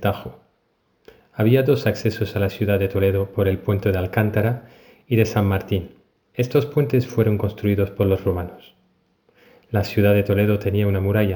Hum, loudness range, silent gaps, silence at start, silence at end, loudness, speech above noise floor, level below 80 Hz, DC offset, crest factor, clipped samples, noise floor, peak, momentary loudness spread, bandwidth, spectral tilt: none; 2 LU; none; 0 s; 0 s; -21 LUFS; 46 dB; -50 dBFS; under 0.1%; 18 dB; under 0.1%; -66 dBFS; -4 dBFS; 9 LU; over 20 kHz; -8 dB/octave